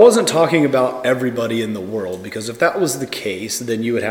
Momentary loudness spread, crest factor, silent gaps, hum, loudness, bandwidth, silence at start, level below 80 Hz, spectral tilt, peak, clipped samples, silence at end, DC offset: 10 LU; 16 dB; none; none; -18 LUFS; 18 kHz; 0 s; -62 dBFS; -4.5 dB/octave; 0 dBFS; under 0.1%; 0 s; under 0.1%